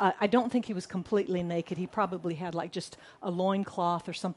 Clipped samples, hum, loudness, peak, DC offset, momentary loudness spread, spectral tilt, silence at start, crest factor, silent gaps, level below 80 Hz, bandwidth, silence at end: under 0.1%; none; -31 LUFS; -10 dBFS; under 0.1%; 9 LU; -6.5 dB/octave; 0 s; 20 dB; none; -68 dBFS; 11.5 kHz; 0.05 s